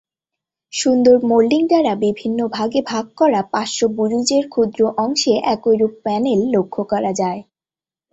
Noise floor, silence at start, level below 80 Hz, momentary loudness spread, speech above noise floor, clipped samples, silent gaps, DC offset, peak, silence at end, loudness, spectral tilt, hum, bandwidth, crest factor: under -90 dBFS; 0.75 s; -58 dBFS; 7 LU; over 74 dB; under 0.1%; none; under 0.1%; -2 dBFS; 0.7 s; -17 LUFS; -4.5 dB/octave; none; 8.4 kHz; 16 dB